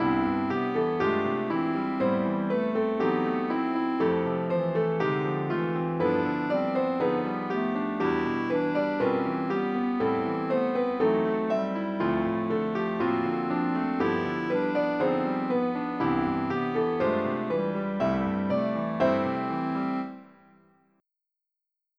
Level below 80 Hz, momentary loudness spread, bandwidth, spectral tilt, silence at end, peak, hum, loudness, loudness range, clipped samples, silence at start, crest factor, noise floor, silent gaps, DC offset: -60 dBFS; 3 LU; 6.4 kHz; -8.5 dB/octave; 1.75 s; -12 dBFS; none; -27 LUFS; 1 LU; under 0.1%; 0 s; 16 dB; -86 dBFS; none; under 0.1%